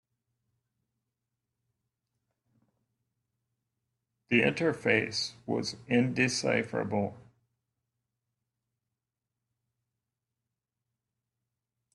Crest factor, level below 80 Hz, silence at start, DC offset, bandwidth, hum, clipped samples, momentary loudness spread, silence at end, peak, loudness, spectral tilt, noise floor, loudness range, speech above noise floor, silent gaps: 24 dB; -72 dBFS; 4.3 s; under 0.1%; 11.5 kHz; none; under 0.1%; 7 LU; 4.75 s; -12 dBFS; -29 LUFS; -4.5 dB/octave; -89 dBFS; 9 LU; 59 dB; none